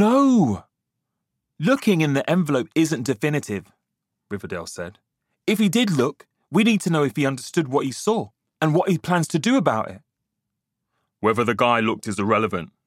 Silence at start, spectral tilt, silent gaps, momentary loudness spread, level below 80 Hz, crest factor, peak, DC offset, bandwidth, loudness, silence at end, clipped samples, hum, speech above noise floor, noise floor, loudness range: 0 s; -5.5 dB/octave; none; 12 LU; -64 dBFS; 20 dB; -2 dBFS; under 0.1%; 16 kHz; -21 LUFS; 0.2 s; under 0.1%; none; 60 dB; -81 dBFS; 4 LU